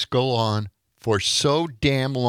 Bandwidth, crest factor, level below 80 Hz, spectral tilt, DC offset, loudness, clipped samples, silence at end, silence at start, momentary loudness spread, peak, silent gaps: 15.5 kHz; 16 dB; -48 dBFS; -4.5 dB/octave; under 0.1%; -22 LUFS; under 0.1%; 0 s; 0 s; 10 LU; -6 dBFS; none